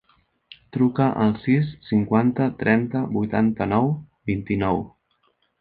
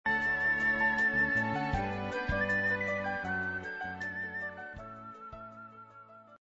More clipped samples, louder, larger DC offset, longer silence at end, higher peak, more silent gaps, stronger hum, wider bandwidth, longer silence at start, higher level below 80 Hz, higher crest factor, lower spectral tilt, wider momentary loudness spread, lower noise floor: neither; first, -22 LUFS vs -31 LUFS; neither; first, 0.7 s vs 0.05 s; first, -2 dBFS vs -18 dBFS; neither; neither; second, 4.7 kHz vs 8 kHz; first, 0.75 s vs 0.05 s; about the same, -50 dBFS vs -52 dBFS; first, 20 dB vs 14 dB; first, -11 dB/octave vs -6 dB/octave; second, 8 LU vs 19 LU; first, -67 dBFS vs -54 dBFS